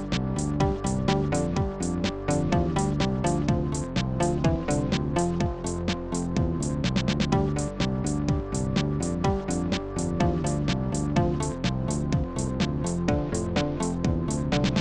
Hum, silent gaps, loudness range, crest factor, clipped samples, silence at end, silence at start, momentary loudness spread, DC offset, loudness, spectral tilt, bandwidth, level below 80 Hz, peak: none; none; 1 LU; 16 dB; under 0.1%; 0 s; 0 s; 4 LU; 0.4%; -27 LUFS; -6 dB/octave; 11 kHz; -36 dBFS; -10 dBFS